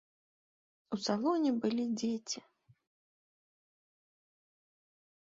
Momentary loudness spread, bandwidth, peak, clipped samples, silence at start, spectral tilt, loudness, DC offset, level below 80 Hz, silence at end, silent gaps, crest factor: 11 LU; 7.6 kHz; -20 dBFS; under 0.1%; 0.9 s; -4.5 dB/octave; -34 LUFS; under 0.1%; -80 dBFS; 2.85 s; none; 20 dB